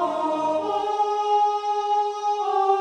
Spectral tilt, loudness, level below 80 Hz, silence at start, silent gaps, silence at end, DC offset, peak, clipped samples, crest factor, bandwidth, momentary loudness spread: -3.5 dB/octave; -23 LUFS; -72 dBFS; 0 s; none; 0 s; under 0.1%; -10 dBFS; under 0.1%; 14 dB; 9.2 kHz; 4 LU